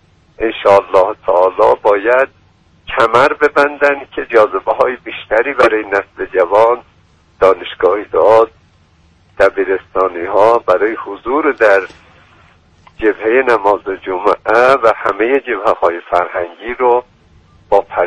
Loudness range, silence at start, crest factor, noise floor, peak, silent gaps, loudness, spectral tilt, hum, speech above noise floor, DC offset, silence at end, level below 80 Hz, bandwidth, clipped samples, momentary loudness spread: 2 LU; 0.4 s; 14 dB; -50 dBFS; 0 dBFS; none; -13 LUFS; -5 dB/octave; none; 38 dB; under 0.1%; 0 s; -46 dBFS; 10.5 kHz; under 0.1%; 8 LU